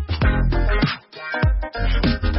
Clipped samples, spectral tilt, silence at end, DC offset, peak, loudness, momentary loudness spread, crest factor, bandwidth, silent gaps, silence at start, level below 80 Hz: under 0.1%; -10.5 dB/octave; 0 s; under 0.1%; -6 dBFS; -22 LUFS; 5 LU; 12 dB; 5.8 kHz; none; 0 s; -22 dBFS